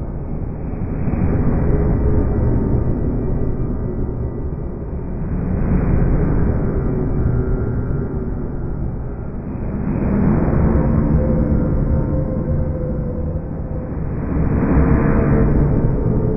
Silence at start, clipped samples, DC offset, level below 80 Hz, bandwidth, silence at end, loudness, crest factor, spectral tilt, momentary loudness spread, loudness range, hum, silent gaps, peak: 0 s; under 0.1%; under 0.1%; -22 dBFS; 2.7 kHz; 0 s; -20 LUFS; 16 dB; -13.5 dB/octave; 10 LU; 4 LU; none; none; -2 dBFS